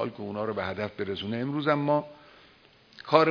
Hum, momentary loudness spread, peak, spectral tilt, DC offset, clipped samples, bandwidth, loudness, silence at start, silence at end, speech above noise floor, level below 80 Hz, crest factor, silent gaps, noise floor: none; 9 LU; -4 dBFS; -7.5 dB/octave; under 0.1%; under 0.1%; 5.4 kHz; -29 LUFS; 0 s; 0 s; 30 dB; -68 dBFS; 24 dB; none; -58 dBFS